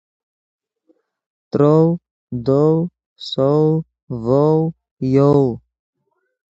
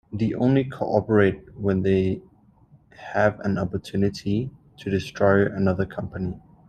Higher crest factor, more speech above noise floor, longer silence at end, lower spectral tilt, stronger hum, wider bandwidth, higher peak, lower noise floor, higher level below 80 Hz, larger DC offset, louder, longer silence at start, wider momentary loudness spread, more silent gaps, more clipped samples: about the same, 16 dB vs 20 dB; first, 47 dB vs 32 dB; first, 0.9 s vs 0.3 s; first, -9.5 dB/octave vs -8 dB/octave; neither; second, 7.6 kHz vs 9.2 kHz; about the same, -2 dBFS vs -4 dBFS; first, -62 dBFS vs -55 dBFS; about the same, -52 dBFS vs -52 dBFS; neither; first, -17 LUFS vs -24 LUFS; first, 1.55 s vs 0.1 s; first, 14 LU vs 11 LU; first, 2.11-2.27 s, 3.06-3.16 s, 4.03-4.07 s, 4.91-4.97 s vs none; neither